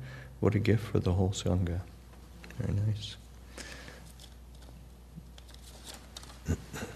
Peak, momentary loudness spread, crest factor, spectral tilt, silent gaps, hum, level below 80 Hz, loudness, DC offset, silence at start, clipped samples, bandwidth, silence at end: -12 dBFS; 22 LU; 22 dB; -6.5 dB/octave; none; none; -48 dBFS; -32 LUFS; under 0.1%; 0 s; under 0.1%; 13.5 kHz; 0 s